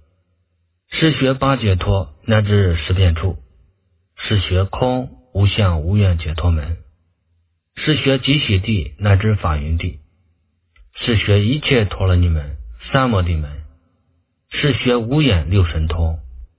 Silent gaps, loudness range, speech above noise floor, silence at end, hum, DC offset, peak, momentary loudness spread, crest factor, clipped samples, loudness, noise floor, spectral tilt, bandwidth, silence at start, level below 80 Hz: none; 2 LU; 50 dB; 0.15 s; none; under 0.1%; 0 dBFS; 11 LU; 18 dB; under 0.1%; -17 LUFS; -65 dBFS; -10.5 dB/octave; 4 kHz; 0.9 s; -26 dBFS